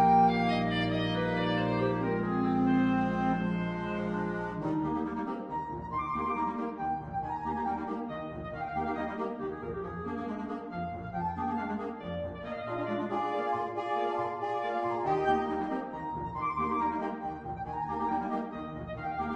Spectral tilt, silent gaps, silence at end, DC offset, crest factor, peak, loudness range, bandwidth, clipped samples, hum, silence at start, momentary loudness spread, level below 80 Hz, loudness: -8 dB/octave; none; 0 s; under 0.1%; 18 dB; -14 dBFS; 7 LU; 9.2 kHz; under 0.1%; none; 0 s; 9 LU; -54 dBFS; -32 LUFS